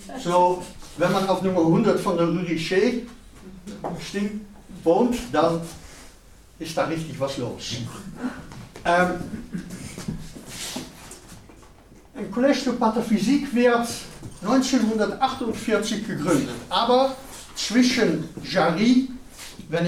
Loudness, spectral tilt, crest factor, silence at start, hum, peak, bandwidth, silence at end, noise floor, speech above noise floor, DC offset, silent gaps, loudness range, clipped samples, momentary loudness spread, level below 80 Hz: -23 LUFS; -5 dB/octave; 18 dB; 0 s; none; -6 dBFS; 15.5 kHz; 0 s; -49 dBFS; 27 dB; under 0.1%; none; 7 LU; under 0.1%; 18 LU; -48 dBFS